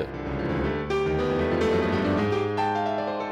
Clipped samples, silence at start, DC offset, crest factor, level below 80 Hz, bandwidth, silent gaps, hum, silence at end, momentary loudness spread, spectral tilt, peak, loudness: under 0.1%; 0 s; under 0.1%; 10 dB; -42 dBFS; 10.5 kHz; none; none; 0 s; 5 LU; -7 dB/octave; -16 dBFS; -26 LUFS